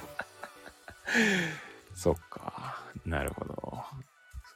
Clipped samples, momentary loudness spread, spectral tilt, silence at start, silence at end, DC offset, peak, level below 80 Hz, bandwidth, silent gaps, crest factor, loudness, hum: under 0.1%; 22 LU; -4.5 dB/octave; 0 s; 0 s; under 0.1%; -14 dBFS; -50 dBFS; 16.5 kHz; none; 20 dB; -33 LUFS; none